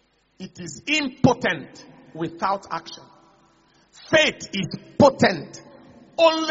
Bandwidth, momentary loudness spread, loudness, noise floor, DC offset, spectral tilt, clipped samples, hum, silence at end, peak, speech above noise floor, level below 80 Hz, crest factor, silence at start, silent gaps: 8 kHz; 23 LU; -21 LUFS; -59 dBFS; under 0.1%; -3 dB/octave; under 0.1%; none; 0 s; -2 dBFS; 37 dB; -56 dBFS; 22 dB; 0.4 s; none